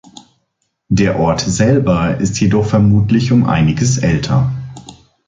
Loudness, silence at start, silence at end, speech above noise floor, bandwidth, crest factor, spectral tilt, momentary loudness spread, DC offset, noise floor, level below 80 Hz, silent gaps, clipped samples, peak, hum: -13 LUFS; 0.9 s; 0.35 s; 56 dB; 9.4 kHz; 12 dB; -6 dB/octave; 4 LU; under 0.1%; -68 dBFS; -34 dBFS; none; under 0.1%; -2 dBFS; none